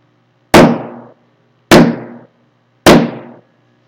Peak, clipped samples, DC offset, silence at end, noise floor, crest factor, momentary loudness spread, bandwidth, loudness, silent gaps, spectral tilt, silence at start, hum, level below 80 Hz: 0 dBFS; 2%; under 0.1%; 0.65 s; -55 dBFS; 12 dB; 19 LU; over 20 kHz; -9 LUFS; none; -5 dB/octave; 0.55 s; none; -36 dBFS